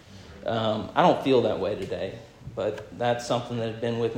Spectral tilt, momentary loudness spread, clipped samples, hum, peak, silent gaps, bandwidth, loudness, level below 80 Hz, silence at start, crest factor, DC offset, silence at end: -6 dB/octave; 14 LU; under 0.1%; none; -6 dBFS; none; 16 kHz; -26 LUFS; -58 dBFS; 0.1 s; 20 dB; under 0.1%; 0 s